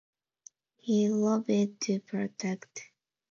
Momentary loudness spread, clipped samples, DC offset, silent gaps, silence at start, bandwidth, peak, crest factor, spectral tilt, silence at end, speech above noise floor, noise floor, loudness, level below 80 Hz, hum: 15 LU; under 0.1%; under 0.1%; none; 0.85 s; 7.2 kHz; -16 dBFS; 16 dB; -5.5 dB/octave; 0.45 s; 30 dB; -59 dBFS; -30 LUFS; -80 dBFS; none